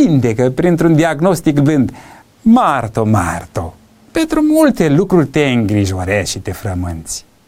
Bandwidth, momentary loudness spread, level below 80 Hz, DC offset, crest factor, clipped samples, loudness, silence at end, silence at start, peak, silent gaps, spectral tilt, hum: 16 kHz; 11 LU; -38 dBFS; under 0.1%; 12 dB; under 0.1%; -14 LUFS; 0.3 s; 0 s; 0 dBFS; none; -6.5 dB/octave; none